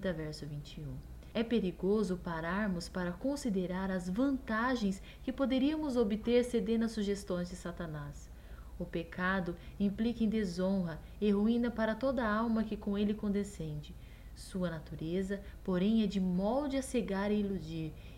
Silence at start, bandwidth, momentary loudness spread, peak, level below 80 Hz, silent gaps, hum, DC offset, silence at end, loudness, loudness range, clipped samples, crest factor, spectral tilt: 0 s; 15.5 kHz; 13 LU; -18 dBFS; -52 dBFS; none; none; under 0.1%; 0 s; -35 LUFS; 4 LU; under 0.1%; 18 dB; -6.5 dB/octave